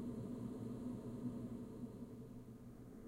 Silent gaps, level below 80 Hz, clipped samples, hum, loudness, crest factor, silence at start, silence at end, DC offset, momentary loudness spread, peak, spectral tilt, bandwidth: none; -66 dBFS; under 0.1%; none; -50 LUFS; 14 dB; 0 s; 0 s; under 0.1%; 9 LU; -34 dBFS; -8.5 dB/octave; 16 kHz